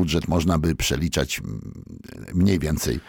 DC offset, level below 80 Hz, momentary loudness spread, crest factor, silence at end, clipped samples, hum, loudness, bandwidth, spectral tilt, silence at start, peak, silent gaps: under 0.1%; -36 dBFS; 18 LU; 14 dB; 0.05 s; under 0.1%; none; -23 LUFS; 19 kHz; -5 dB/octave; 0 s; -10 dBFS; none